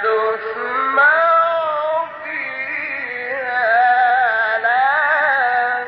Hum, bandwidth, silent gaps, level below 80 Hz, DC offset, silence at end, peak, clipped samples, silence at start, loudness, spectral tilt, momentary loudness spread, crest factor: none; 5.6 kHz; none; -68 dBFS; under 0.1%; 0 s; -4 dBFS; under 0.1%; 0 s; -16 LUFS; -5.5 dB/octave; 10 LU; 12 dB